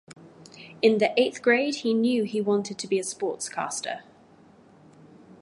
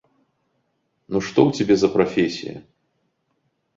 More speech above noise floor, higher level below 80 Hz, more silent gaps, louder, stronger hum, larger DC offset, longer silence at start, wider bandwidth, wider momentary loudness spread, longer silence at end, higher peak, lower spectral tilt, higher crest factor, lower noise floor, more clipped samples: second, 30 dB vs 51 dB; second, -76 dBFS vs -56 dBFS; neither; second, -25 LUFS vs -20 LUFS; neither; neither; second, 0.2 s vs 1.1 s; first, 11.5 kHz vs 7.6 kHz; second, 11 LU vs 15 LU; second, 0.1 s vs 1.15 s; second, -8 dBFS vs -2 dBFS; second, -4 dB/octave vs -6 dB/octave; about the same, 20 dB vs 20 dB; second, -54 dBFS vs -71 dBFS; neither